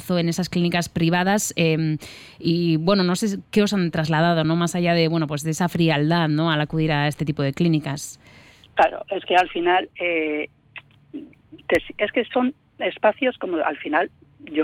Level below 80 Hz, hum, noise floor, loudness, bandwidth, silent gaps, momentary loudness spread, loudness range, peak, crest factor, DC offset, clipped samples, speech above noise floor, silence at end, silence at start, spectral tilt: -52 dBFS; none; -45 dBFS; -22 LUFS; 16 kHz; none; 10 LU; 4 LU; -6 dBFS; 16 dB; under 0.1%; under 0.1%; 24 dB; 0 s; 0 s; -5.5 dB/octave